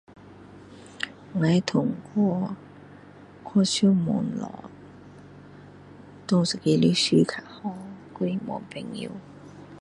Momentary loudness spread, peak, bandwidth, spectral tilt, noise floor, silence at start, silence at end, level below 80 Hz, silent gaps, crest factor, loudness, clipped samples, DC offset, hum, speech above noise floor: 25 LU; -6 dBFS; 11 kHz; -5.5 dB/octave; -48 dBFS; 0.25 s; 0 s; -62 dBFS; none; 22 dB; -25 LUFS; under 0.1%; under 0.1%; none; 24 dB